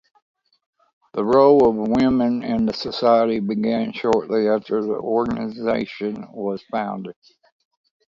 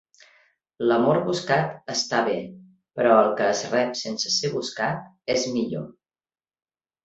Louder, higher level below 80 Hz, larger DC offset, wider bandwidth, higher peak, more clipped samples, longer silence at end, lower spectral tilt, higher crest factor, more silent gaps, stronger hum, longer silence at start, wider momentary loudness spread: first, -20 LUFS vs -23 LUFS; first, -54 dBFS vs -64 dBFS; neither; about the same, 7.6 kHz vs 8.2 kHz; about the same, -4 dBFS vs -4 dBFS; neither; second, 0.95 s vs 1.15 s; first, -7.5 dB/octave vs -4 dB/octave; about the same, 18 dB vs 20 dB; neither; neither; first, 1.15 s vs 0.8 s; about the same, 13 LU vs 12 LU